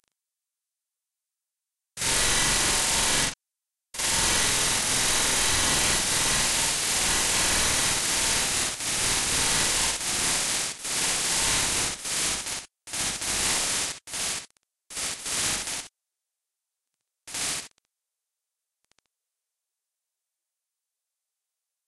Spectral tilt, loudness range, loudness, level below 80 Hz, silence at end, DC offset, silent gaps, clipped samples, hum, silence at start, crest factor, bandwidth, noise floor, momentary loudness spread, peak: -0.5 dB/octave; 15 LU; -23 LUFS; -44 dBFS; 4.2 s; under 0.1%; none; under 0.1%; none; 1.95 s; 18 dB; 13.5 kHz; -88 dBFS; 9 LU; -10 dBFS